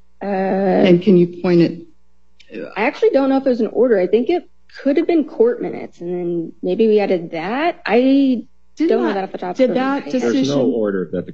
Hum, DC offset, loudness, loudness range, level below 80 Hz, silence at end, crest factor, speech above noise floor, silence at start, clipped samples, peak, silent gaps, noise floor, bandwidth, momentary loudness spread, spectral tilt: none; 0.7%; -17 LUFS; 2 LU; -60 dBFS; 0 s; 16 dB; 43 dB; 0.2 s; under 0.1%; 0 dBFS; none; -60 dBFS; 7.4 kHz; 10 LU; -7.5 dB/octave